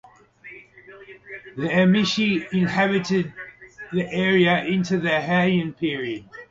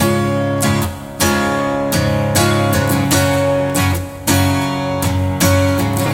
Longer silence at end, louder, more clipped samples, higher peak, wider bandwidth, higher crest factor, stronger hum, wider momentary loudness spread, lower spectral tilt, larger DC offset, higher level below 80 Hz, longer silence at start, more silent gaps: about the same, 0.05 s vs 0 s; second, -21 LUFS vs -15 LUFS; neither; second, -6 dBFS vs -2 dBFS; second, 7.6 kHz vs 17 kHz; about the same, 18 dB vs 14 dB; neither; first, 21 LU vs 4 LU; about the same, -6 dB/octave vs -5 dB/octave; neither; second, -60 dBFS vs -36 dBFS; first, 0.45 s vs 0 s; neither